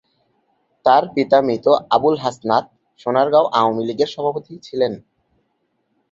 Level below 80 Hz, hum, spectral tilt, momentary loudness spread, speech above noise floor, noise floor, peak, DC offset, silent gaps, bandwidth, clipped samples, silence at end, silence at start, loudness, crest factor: -62 dBFS; none; -6 dB/octave; 9 LU; 52 dB; -69 dBFS; -2 dBFS; under 0.1%; none; 7.6 kHz; under 0.1%; 1.1 s; 0.85 s; -18 LUFS; 18 dB